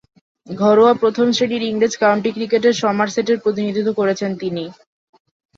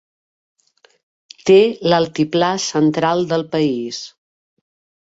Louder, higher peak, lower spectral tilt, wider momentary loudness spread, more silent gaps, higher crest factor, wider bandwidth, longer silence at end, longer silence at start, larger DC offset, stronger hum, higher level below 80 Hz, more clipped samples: about the same, -17 LUFS vs -16 LUFS; about the same, -2 dBFS vs -2 dBFS; about the same, -5 dB/octave vs -5 dB/octave; about the same, 11 LU vs 12 LU; neither; about the same, 16 dB vs 16 dB; about the same, 7.6 kHz vs 8 kHz; about the same, 0.85 s vs 0.95 s; second, 0.45 s vs 1.45 s; neither; neither; about the same, -62 dBFS vs -60 dBFS; neither